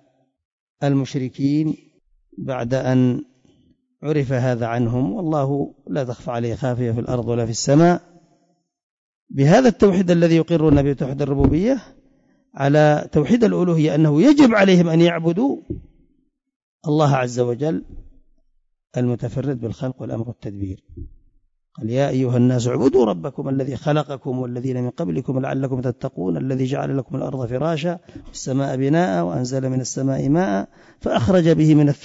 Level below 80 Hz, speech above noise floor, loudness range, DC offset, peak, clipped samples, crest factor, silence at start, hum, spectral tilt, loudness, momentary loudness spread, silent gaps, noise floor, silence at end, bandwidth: -44 dBFS; 46 dB; 8 LU; under 0.1%; -4 dBFS; under 0.1%; 16 dB; 0.8 s; none; -7 dB/octave; -19 LUFS; 14 LU; 8.83-9.27 s, 16.56-16.79 s; -65 dBFS; 0 s; 8 kHz